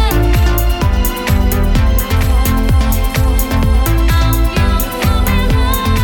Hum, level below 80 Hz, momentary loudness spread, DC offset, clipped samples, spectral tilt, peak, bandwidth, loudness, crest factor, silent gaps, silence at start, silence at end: none; -14 dBFS; 2 LU; under 0.1%; under 0.1%; -5.5 dB/octave; 0 dBFS; 18 kHz; -14 LUFS; 10 dB; none; 0 s; 0 s